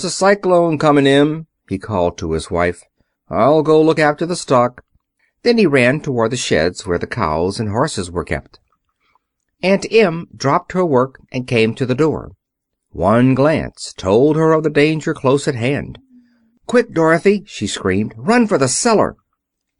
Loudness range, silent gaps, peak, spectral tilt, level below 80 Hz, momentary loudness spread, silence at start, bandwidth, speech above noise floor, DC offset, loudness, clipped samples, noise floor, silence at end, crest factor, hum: 4 LU; none; -2 dBFS; -5.5 dB/octave; -44 dBFS; 10 LU; 0 s; 11 kHz; 61 dB; under 0.1%; -16 LUFS; under 0.1%; -76 dBFS; 0.65 s; 14 dB; none